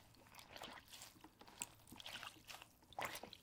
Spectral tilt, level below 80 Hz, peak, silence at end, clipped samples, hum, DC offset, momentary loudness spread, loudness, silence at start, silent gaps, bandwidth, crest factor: -1.5 dB/octave; -78 dBFS; -26 dBFS; 0 s; under 0.1%; none; under 0.1%; 13 LU; -53 LUFS; 0 s; none; 17.5 kHz; 28 dB